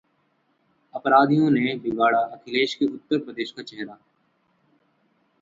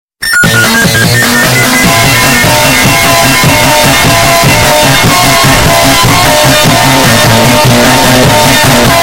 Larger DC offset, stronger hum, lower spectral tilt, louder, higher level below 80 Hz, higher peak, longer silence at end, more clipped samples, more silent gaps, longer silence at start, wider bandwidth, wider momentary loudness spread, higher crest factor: neither; neither; first, -6.5 dB/octave vs -3 dB/octave; second, -22 LUFS vs -4 LUFS; second, -68 dBFS vs -24 dBFS; second, -4 dBFS vs 0 dBFS; first, 1.5 s vs 0 s; second, under 0.1% vs 3%; neither; first, 0.95 s vs 0.2 s; second, 7.6 kHz vs over 20 kHz; first, 18 LU vs 1 LU; first, 22 dB vs 4 dB